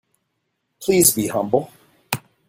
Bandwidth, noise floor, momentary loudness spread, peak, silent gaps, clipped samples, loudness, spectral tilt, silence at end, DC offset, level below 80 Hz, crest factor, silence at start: 16.5 kHz; -74 dBFS; 14 LU; 0 dBFS; none; under 0.1%; -19 LUFS; -3.5 dB/octave; 0.3 s; under 0.1%; -56 dBFS; 22 dB; 0.8 s